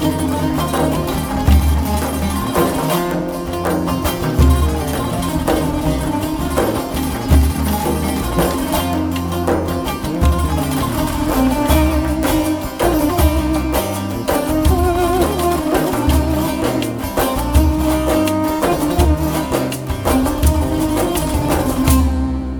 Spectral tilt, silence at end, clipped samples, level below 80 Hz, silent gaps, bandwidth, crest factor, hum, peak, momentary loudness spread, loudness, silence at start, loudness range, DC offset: -6 dB/octave; 0 s; under 0.1%; -22 dBFS; none; over 20 kHz; 16 dB; none; 0 dBFS; 5 LU; -17 LUFS; 0 s; 1 LU; under 0.1%